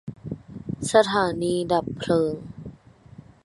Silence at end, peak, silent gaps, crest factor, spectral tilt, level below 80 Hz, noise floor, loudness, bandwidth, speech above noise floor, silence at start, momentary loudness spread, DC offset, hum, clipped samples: 0.75 s; -4 dBFS; none; 22 dB; -5 dB/octave; -54 dBFS; -48 dBFS; -23 LUFS; 11.5 kHz; 25 dB; 0.05 s; 19 LU; under 0.1%; none; under 0.1%